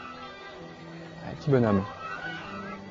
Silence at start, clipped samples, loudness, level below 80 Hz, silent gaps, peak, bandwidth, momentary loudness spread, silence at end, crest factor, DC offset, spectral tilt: 0 s; under 0.1%; -29 LUFS; -58 dBFS; none; -10 dBFS; 7.6 kHz; 19 LU; 0 s; 20 dB; under 0.1%; -8 dB/octave